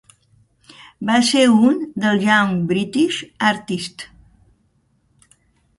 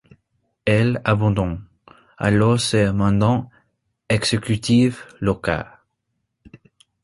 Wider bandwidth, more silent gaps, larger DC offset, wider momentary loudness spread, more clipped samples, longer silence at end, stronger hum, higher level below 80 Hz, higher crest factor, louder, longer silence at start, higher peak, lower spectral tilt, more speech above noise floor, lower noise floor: about the same, 11.5 kHz vs 11.5 kHz; neither; neither; first, 14 LU vs 10 LU; neither; first, 1.75 s vs 1.4 s; neither; second, -58 dBFS vs -42 dBFS; about the same, 18 dB vs 18 dB; first, -17 LUFS vs -20 LUFS; first, 1 s vs 0.65 s; about the same, -2 dBFS vs -2 dBFS; second, -4.5 dB/octave vs -6 dB/octave; second, 45 dB vs 56 dB; second, -62 dBFS vs -75 dBFS